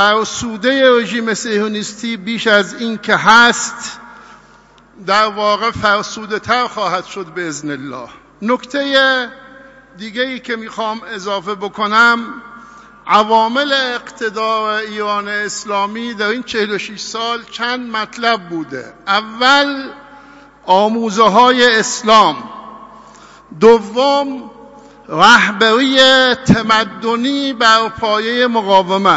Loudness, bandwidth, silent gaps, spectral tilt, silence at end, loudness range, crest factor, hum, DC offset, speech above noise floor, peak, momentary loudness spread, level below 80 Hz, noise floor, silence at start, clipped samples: -13 LUFS; 11 kHz; none; -3 dB/octave; 0 s; 7 LU; 14 dB; none; under 0.1%; 32 dB; 0 dBFS; 16 LU; -52 dBFS; -45 dBFS; 0 s; under 0.1%